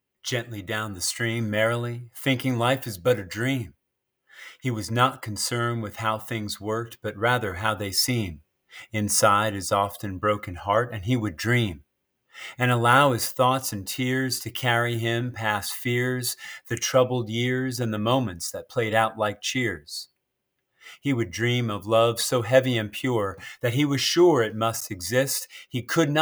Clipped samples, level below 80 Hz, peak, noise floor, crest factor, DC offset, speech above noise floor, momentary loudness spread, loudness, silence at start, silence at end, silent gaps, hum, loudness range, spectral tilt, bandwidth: under 0.1%; -62 dBFS; -4 dBFS; -78 dBFS; 22 dB; under 0.1%; 54 dB; 10 LU; -25 LUFS; 0.25 s; 0 s; none; none; 4 LU; -4.5 dB/octave; over 20 kHz